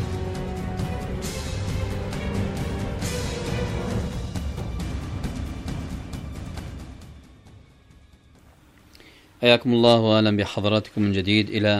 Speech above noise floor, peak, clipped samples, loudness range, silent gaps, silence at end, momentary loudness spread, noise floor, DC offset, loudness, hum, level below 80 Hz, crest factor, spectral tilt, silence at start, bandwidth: 33 dB; -2 dBFS; under 0.1%; 16 LU; none; 0 s; 17 LU; -53 dBFS; under 0.1%; -25 LUFS; none; -36 dBFS; 22 dB; -6 dB/octave; 0 s; 15 kHz